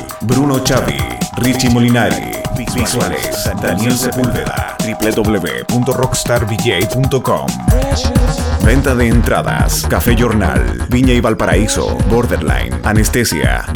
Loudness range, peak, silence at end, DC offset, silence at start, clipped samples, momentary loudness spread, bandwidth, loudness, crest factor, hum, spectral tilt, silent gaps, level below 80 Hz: 3 LU; 0 dBFS; 0 s; under 0.1%; 0 s; under 0.1%; 5 LU; over 20 kHz; -14 LUFS; 12 dB; none; -5 dB/octave; none; -20 dBFS